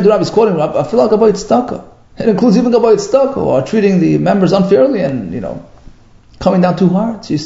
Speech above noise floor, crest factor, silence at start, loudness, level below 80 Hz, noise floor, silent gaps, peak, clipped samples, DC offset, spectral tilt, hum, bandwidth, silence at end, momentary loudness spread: 30 dB; 12 dB; 0 s; -12 LUFS; -42 dBFS; -41 dBFS; none; 0 dBFS; under 0.1%; under 0.1%; -7 dB/octave; none; 7.8 kHz; 0 s; 9 LU